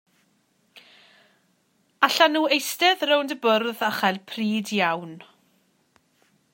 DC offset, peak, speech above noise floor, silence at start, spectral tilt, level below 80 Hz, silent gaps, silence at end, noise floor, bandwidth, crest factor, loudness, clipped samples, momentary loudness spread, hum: under 0.1%; -2 dBFS; 44 dB; 0.75 s; -3 dB/octave; -82 dBFS; none; 1.3 s; -67 dBFS; 16.5 kHz; 24 dB; -22 LUFS; under 0.1%; 8 LU; none